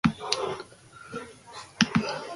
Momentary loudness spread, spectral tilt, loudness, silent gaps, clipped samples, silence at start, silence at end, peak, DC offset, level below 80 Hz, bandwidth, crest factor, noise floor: 19 LU; -4 dB/octave; -28 LUFS; none; under 0.1%; 0.05 s; 0 s; 0 dBFS; under 0.1%; -54 dBFS; 11.5 kHz; 30 dB; -49 dBFS